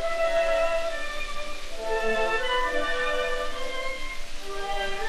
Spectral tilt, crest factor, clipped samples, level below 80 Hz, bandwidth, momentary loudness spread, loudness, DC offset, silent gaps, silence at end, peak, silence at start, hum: -2.5 dB/octave; 12 dB; under 0.1%; -36 dBFS; 13 kHz; 11 LU; -28 LUFS; under 0.1%; none; 0 s; -14 dBFS; 0 s; none